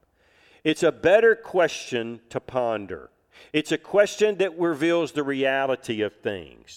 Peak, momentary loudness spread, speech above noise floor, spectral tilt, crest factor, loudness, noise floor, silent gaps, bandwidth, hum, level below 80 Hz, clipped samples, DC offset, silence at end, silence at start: -6 dBFS; 13 LU; 37 dB; -4.5 dB/octave; 18 dB; -24 LUFS; -60 dBFS; none; 14 kHz; none; -62 dBFS; under 0.1%; under 0.1%; 0 s; 0.65 s